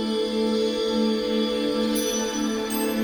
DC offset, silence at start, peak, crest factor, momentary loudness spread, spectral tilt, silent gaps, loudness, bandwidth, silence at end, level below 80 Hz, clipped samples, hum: under 0.1%; 0 s; -12 dBFS; 12 dB; 2 LU; -3.5 dB/octave; none; -24 LUFS; over 20 kHz; 0 s; -52 dBFS; under 0.1%; none